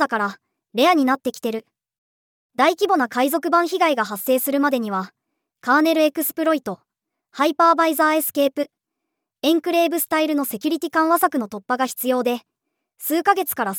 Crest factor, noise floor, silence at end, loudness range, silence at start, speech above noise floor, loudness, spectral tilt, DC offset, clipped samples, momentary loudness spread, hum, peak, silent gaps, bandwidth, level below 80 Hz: 18 dB; -81 dBFS; 0 s; 2 LU; 0 s; 61 dB; -20 LUFS; -3 dB/octave; under 0.1%; under 0.1%; 11 LU; none; -4 dBFS; 1.98-2.49 s; over 20 kHz; -78 dBFS